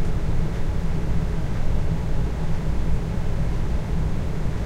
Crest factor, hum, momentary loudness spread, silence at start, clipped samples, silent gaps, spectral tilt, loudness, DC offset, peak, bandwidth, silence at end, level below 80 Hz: 12 dB; none; 1 LU; 0 s; under 0.1%; none; -7.5 dB/octave; -27 LUFS; under 0.1%; -8 dBFS; 8.6 kHz; 0 s; -24 dBFS